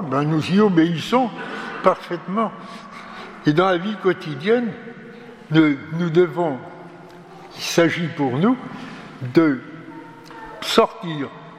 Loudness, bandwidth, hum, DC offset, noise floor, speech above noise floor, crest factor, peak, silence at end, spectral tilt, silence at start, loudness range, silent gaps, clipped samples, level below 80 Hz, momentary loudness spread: -20 LUFS; 15 kHz; none; under 0.1%; -41 dBFS; 22 dB; 20 dB; 0 dBFS; 0 s; -6 dB/octave; 0 s; 2 LU; none; under 0.1%; -62 dBFS; 21 LU